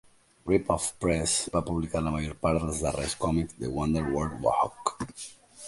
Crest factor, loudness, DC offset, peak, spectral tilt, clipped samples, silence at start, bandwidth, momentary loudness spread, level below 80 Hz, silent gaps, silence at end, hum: 20 dB; -29 LUFS; under 0.1%; -8 dBFS; -5 dB/octave; under 0.1%; 0.45 s; 11.5 kHz; 7 LU; -44 dBFS; none; 0 s; none